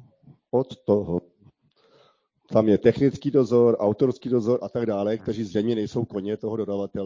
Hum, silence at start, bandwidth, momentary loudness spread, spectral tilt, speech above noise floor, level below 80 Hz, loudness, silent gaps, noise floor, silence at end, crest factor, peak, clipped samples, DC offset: none; 0.55 s; 7.6 kHz; 9 LU; -8.5 dB/octave; 39 dB; -54 dBFS; -24 LUFS; none; -62 dBFS; 0 s; 18 dB; -6 dBFS; under 0.1%; under 0.1%